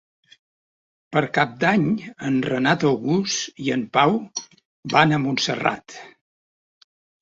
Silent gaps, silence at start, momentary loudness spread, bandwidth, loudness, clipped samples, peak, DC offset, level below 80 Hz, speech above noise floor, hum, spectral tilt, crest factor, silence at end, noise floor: 4.65-4.83 s; 1.1 s; 14 LU; 8 kHz; -21 LUFS; under 0.1%; -2 dBFS; under 0.1%; -62 dBFS; over 69 dB; none; -4.5 dB/octave; 22 dB; 1.1 s; under -90 dBFS